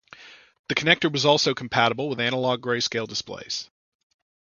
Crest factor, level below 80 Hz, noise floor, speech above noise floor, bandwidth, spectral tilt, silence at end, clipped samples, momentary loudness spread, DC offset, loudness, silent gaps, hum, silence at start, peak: 26 dB; -62 dBFS; -48 dBFS; 24 dB; 7.4 kHz; -3.5 dB/octave; 0.95 s; under 0.1%; 11 LU; under 0.1%; -23 LUFS; 0.59-0.64 s; none; 0.2 s; 0 dBFS